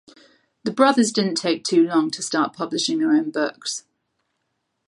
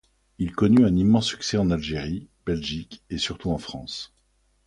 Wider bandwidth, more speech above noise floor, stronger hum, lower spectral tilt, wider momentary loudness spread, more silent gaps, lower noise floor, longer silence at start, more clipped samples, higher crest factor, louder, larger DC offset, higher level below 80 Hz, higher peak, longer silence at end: about the same, 11.5 kHz vs 11 kHz; first, 55 dB vs 43 dB; neither; second, -3.5 dB/octave vs -6 dB/octave; second, 12 LU vs 17 LU; neither; first, -75 dBFS vs -66 dBFS; first, 0.65 s vs 0.4 s; neither; about the same, 20 dB vs 16 dB; first, -21 LUFS vs -24 LUFS; neither; second, -74 dBFS vs -44 dBFS; first, -2 dBFS vs -8 dBFS; first, 1.05 s vs 0.6 s